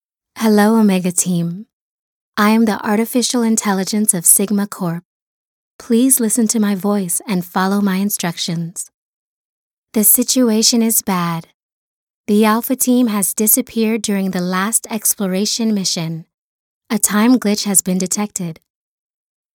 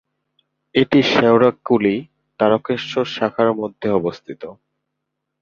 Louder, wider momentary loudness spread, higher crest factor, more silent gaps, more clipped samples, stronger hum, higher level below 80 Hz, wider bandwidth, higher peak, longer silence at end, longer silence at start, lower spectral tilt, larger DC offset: first, -15 LUFS vs -18 LUFS; about the same, 12 LU vs 13 LU; about the same, 16 dB vs 18 dB; first, 1.73-2.33 s, 5.05-5.79 s, 8.94-9.87 s, 11.54-12.24 s, 16.34-16.81 s vs none; neither; neither; about the same, -62 dBFS vs -58 dBFS; first, 19 kHz vs 7.2 kHz; about the same, 0 dBFS vs -2 dBFS; about the same, 1 s vs 0.9 s; second, 0.35 s vs 0.75 s; second, -3.5 dB/octave vs -6.5 dB/octave; neither